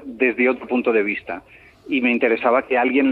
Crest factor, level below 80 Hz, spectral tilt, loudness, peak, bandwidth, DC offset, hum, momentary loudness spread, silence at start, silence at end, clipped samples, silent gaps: 16 dB; -60 dBFS; -7 dB/octave; -19 LUFS; -4 dBFS; 4.5 kHz; under 0.1%; none; 9 LU; 0 s; 0 s; under 0.1%; none